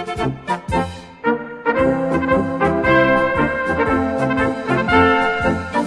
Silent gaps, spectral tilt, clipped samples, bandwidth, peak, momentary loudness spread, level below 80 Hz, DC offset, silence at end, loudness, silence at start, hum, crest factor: none; -6.5 dB/octave; under 0.1%; 11 kHz; -2 dBFS; 9 LU; -38 dBFS; under 0.1%; 0 s; -18 LUFS; 0 s; none; 16 dB